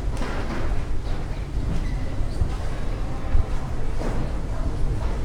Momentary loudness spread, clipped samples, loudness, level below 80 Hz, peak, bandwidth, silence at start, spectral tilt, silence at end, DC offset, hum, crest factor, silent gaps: 4 LU; under 0.1%; -29 LUFS; -24 dBFS; -8 dBFS; 10 kHz; 0 s; -7 dB/octave; 0 s; under 0.1%; none; 14 dB; none